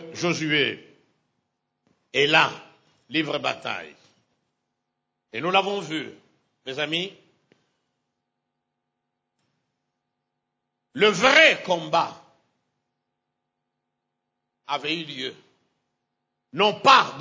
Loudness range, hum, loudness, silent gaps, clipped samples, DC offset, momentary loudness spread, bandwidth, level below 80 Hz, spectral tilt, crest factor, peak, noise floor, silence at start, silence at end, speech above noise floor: 13 LU; none; -21 LUFS; none; under 0.1%; under 0.1%; 19 LU; 8 kHz; -74 dBFS; -3.5 dB/octave; 24 dB; -2 dBFS; -81 dBFS; 0 s; 0 s; 59 dB